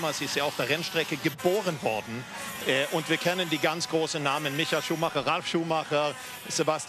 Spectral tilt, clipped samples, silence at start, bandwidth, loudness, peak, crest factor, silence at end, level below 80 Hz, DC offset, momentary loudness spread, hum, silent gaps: -3.5 dB/octave; under 0.1%; 0 s; 14 kHz; -28 LUFS; -12 dBFS; 18 dB; 0 s; -68 dBFS; under 0.1%; 5 LU; none; none